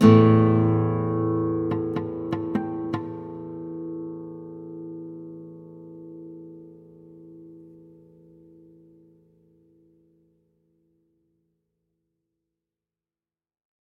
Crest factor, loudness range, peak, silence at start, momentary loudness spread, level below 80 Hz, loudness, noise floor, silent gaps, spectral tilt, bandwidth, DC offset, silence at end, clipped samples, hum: 24 dB; 25 LU; -4 dBFS; 0 s; 25 LU; -62 dBFS; -24 LUFS; under -90 dBFS; none; -9.5 dB/octave; 6.4 kHz; under 0.1%; 6.35 s; under 0.1%; none